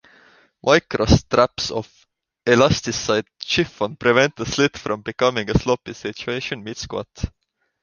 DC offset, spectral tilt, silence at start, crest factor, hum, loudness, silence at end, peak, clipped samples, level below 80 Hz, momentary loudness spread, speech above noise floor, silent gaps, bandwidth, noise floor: under 0.1%; -4.5 dB/octave; 0.65 s; 20 dB; none; -20 LUFS; 0.55 s; -2 dBFS; under 0.1%; -38 dBFS; 13 LU; 33 dB; none; 10 kHz; -54 dBFS